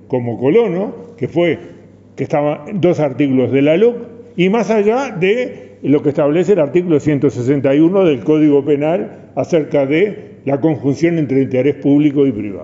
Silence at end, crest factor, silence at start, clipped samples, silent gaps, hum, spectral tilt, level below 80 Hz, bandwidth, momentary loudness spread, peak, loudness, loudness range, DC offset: 0 s; 14 dB; 0.1 s; under 0.1%; none; none; -8 dB/octave; -56 dBFS; 7.8 kHz; 9 LU; -2 dBFS; -15 LUFS; 3 LU; under 0.1%